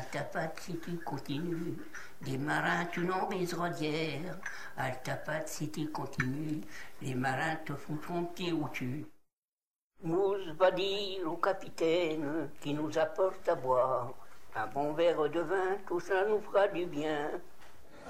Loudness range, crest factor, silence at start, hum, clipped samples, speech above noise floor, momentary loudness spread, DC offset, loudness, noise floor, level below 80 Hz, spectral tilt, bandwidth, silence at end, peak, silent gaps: 5 LU; 20 dB; 0 s; none; under 0.1%; over 56 dB; 11 LU; 0.7%; -34 LUFS; under -90 dBFS; -66 dBFS; -5.5 dB/octave; 16 kHz; 0 s; -14 dBFS; 9.38-9.52 s, 9.67-9.71 s, 9.82-9.90 s